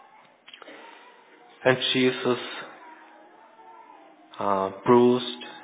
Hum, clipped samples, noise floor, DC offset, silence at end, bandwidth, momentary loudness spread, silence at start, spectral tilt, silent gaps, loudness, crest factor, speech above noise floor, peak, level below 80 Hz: none; under 0.1%; -53 dBFS; under 0.1%; 0 s; 4 kHz; 26 LU; 0.65 s; -9.5 dB/octave; none; -24 LUFS; 22 dB; 31 dB; -4 dBFS; -72 dBFS